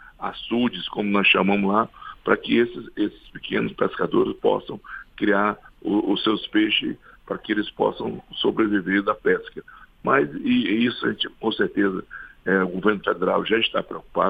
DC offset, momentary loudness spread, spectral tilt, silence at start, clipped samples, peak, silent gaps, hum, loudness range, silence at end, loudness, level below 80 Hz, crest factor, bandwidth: under 0.1%; 12 LU; -8 dB/octave; 0 s; under 0.1%; -4 dBFS; none; none; 2 LU; 0 s; -23 LUFS; -54 dBFS; 20 dB; 5 kHz